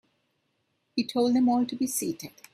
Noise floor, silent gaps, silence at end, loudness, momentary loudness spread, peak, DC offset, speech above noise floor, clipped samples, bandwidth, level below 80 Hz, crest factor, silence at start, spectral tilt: -75 dBFS; none; 0.25 s; -27 LUFS; 11 LU; -14 dBFS; under 0.1%; 49 dB; under 0.1%; 15 kHz; -72 dBFS; 16 dB; 0.95 s; -4 dB/octave